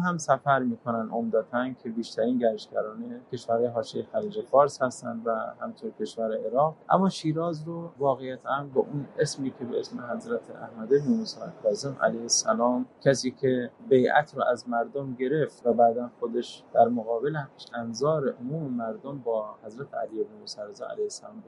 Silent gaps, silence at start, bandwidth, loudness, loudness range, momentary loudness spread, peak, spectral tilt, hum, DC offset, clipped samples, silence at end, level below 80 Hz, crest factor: none; 0 s; 11.5 kHz; -28 LUFS; 5 LU; 12 LU; -6 dBFS; -5 dB/octave; none; under 0.1%; under 0.1%; 0.05 s; -74 dBFS; 20 dB